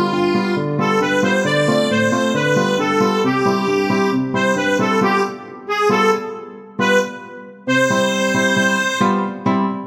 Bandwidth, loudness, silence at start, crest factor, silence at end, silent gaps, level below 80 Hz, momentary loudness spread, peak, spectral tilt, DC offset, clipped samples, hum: 16.5 kHz; -17 LUFS; 0 s; 16 dB; 0 s; none; -60 dBFS; 7 LU; -2 dBFS; -5 dB/octave; under 0.1%; under 0.1%; none